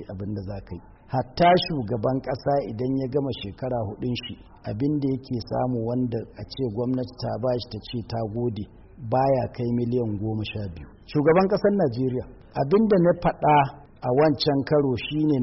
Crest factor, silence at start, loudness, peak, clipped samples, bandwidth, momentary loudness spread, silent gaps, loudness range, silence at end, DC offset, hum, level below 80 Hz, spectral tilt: 16 dB; 0 s; -25 LUFS; -10 dBFS; under 0.1%; 6 kHz; 14 LU; none; 6 LU; 0 s; under 0.1%; none; -48 dBFS; -6 dB/octave